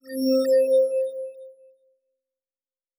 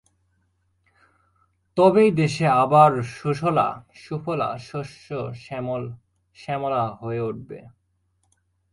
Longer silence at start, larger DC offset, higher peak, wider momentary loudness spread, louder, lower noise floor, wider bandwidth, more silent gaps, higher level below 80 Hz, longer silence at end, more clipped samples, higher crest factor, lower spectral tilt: second, 0.05 s vs 1.75 s; neither; second, -12 dBFS vs -2 dBFS; about the same, 16 LU vs 18 LU; about the same, -21 LUFS vs -22 LUFS; first, under -90 dBFS vs -69 dBFS; first, 16.5 kHz vs 11.5 kHz; neither; second, under -90 dBFS vs -60 dBFS; first, 1.45 s vs 1.05 s; neither; second, 14 dB vs 22 dB; second, -4 dB/octave vs -7 dB/octave